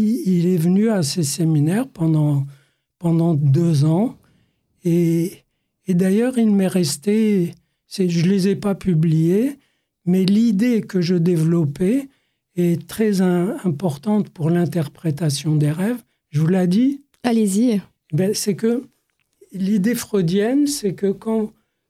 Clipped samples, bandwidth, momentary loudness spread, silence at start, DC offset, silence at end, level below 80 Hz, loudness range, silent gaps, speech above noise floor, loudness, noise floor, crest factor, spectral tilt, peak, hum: under 0.1%; 15.5 kHz; 8 LU; 0 s; under 0.1%; 0.4 s; -58 dBFS; 2 LU; none; 46 dB; -19 LUFS; -64 dBFS; 16 dB; -7 dB/octave; -2 dBFS; none